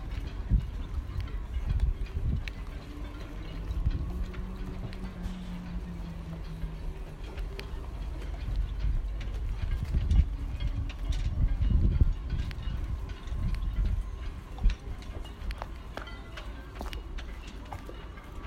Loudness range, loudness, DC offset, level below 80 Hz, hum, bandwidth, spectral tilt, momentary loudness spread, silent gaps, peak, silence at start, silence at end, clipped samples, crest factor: 9 LU; -36 LUFS; under 0.1%; -32 dBFS; none; 9 kHz; -7 dB/octave; 13 LU; none; -10 dBFS; 0 s; 0 s; under 0.1%; 22 dB